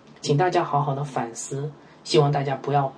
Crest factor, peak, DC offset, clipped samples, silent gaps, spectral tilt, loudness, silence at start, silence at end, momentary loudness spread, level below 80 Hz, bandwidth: 18 dB; -6 dBFS; under 0.1%; under 0.1%; none; -5.5 dB/octave; -24 LUFS; 0.25 s; 0 s; 11 LU; -64 dBFS; 10.5 kHz